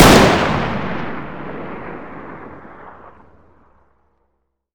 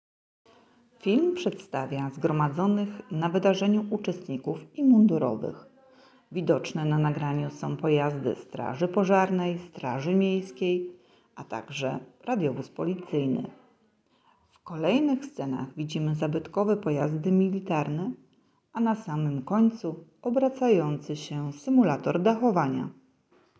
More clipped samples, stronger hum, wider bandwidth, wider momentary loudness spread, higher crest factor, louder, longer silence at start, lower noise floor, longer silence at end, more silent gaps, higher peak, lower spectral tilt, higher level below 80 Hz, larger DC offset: first, 0.1% vs under 0.1%; neither; first, over 20 kHz vs 8 kHz; first, 26 LU vs 11 LU; about the same, 18 dB vs 18 dB; first, -17 LUFS vs -27 LUFS; second, 0 s vs 1.05 s; about the same, -69 dBFS vs -67 dBFS; first, 1.65 s vs 0.65 s; neither; first, 0 dBFS vs -10 dBFS; second, -4.5 dB/octave vs -7.5 dB/octave; first, -34 dBFS vs -68 dBFS; neither